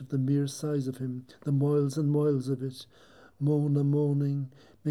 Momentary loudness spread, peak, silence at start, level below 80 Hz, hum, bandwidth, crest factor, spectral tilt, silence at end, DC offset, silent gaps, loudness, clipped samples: 11 LU; -16 dBFS; 0 s; -74 dBFS; none; 12 kHz; 12 dB; -8.5 dB/octave; 0 s; under 0.1%; none; -29 LUFS; under 0.1%